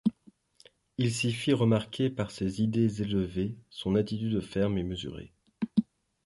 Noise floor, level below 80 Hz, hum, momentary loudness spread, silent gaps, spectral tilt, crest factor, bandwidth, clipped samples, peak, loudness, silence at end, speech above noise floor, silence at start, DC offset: -61 dBFS; -54 dBFS; none; 11 LU; none; -6.5 dB/octave; 18 dB; 11.5 kHz; under 0.1%; -12 dBFS; -30 LUFS; 0.4 s; 32 dB; 0.05 s; under 0.1%